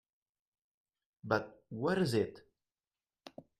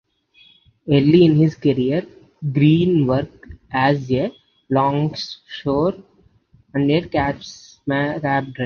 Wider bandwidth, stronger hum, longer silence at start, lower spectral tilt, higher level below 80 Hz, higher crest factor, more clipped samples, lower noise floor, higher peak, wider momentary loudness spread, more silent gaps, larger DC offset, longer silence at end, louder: first, 14 kHz vs 6.8 kHz; neither; first, 1.25 s vs 0.85 s; second, -6.5 dB/octave vs -8 dB/octave; second, -72 dBFS vs -48 dBFS; about the same, 22 dB vs 18 dB; neither; first, under -90 dBFS vs -55 dBFS; second, -16 dBFS vs -2 dBFS; first, 22 LU vs 15 LU; neither; neither; first, 0.2 s vs 0 s; second, -35 LUFS vs -19 LUFS